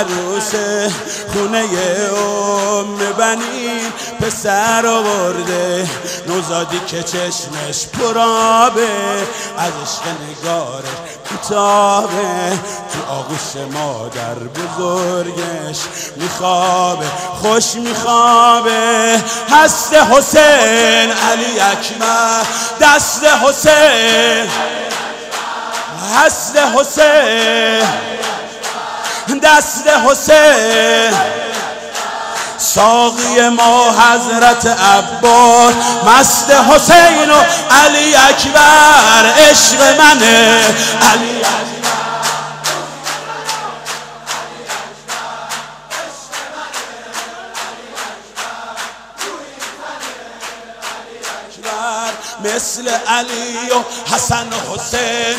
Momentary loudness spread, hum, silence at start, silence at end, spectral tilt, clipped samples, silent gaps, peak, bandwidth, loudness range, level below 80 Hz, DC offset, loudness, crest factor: 18 LU; none; 0 s; 0 s; -1.5 dB/octave; 0.4%; none; 0 dBFS; 16.5 kHz; 17 LU; -46 dBFS; under 0.1%; -11 LUFS; 12 dB